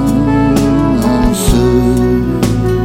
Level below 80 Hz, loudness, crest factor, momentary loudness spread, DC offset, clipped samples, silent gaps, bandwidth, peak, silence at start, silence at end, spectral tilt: -20 dBFS; -11 LUFS; 10 dB; 3 LU; under 0.1%; under 0.1%; none; 16.5 kHz; 0 dBFS; 0 s; 0 s; -6.5 dB/octave